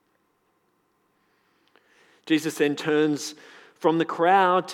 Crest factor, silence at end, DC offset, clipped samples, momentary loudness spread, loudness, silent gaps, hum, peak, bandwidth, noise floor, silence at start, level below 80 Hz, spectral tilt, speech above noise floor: 20 dB; 0 s; under 0.1%; under 0.1%; 11 LU; -23 LUFS; none; none; -6 dBFS; 16 kHz; -69 dBFS; 2.25 s; -90 dBFS; -4.5 dB/octave; 47 dB